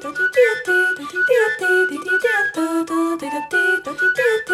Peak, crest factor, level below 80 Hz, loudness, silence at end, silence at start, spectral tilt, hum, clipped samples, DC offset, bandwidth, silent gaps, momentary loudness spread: -4 dBFS; 14 dB; -64 dBFS; -18 LUFS; 0 s; 0 s; -3 dB/octave; none; under 0.1%; under 0.1%; 16 kHz; none; 5 LU